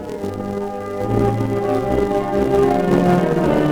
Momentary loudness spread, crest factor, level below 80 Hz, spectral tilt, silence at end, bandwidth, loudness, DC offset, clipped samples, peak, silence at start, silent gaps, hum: 10 LU; 14 dB; -36 dBFS; -8 dB/octave; 0 s; 18.5 kHz; -18 LUFS; under 0.1%; under 0.1%; -2 dBFS; 0 s; none; none